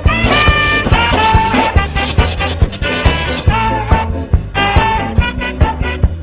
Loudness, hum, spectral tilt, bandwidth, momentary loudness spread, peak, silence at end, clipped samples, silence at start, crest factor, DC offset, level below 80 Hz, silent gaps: -13 LUFS; none; -9.5 dB/octave; 4 kHz; 6 LU; 0 dBFS; 0 s; 0.3%; 0 s; 12 dB; under 0.1%; -16 dBFS; none